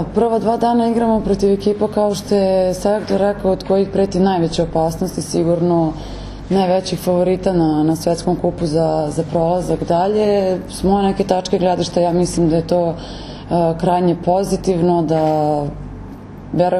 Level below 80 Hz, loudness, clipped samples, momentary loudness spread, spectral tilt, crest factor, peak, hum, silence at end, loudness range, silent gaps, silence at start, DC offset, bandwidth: -36 dBFS; -17 LUFS; under 0.1%; 6 LU; -6.5 dB/octave; 16 dB; 0 dBFS; none; 0 s; 1 LU; none; 0 s; under 0.1%; 14 kHz